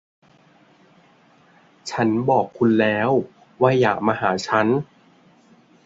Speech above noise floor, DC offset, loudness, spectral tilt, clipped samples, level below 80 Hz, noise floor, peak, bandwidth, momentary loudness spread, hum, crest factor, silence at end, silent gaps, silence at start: 36 dB; under 0.1%; -20 LUFS; -6.5 dB/octave; under 0.1%; -62 dBFS; -55 dBFS; -2 dBFS; 7.8 kHz; 11 LU; none; 20 dB; 1 s; none; 1.85 s